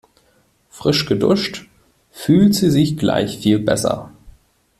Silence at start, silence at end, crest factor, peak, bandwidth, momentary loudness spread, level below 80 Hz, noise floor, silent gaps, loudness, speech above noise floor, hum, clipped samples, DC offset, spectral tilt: 0.75 s; 0.5 s; 16 dB; -2 dBFS; 14.5 kHz; 12 LU; -48 dBFS; -58 dBFS; none; -17 LUFS; 43 dB; none; under 0.1%; under 0.1%; -5.5 dB/octave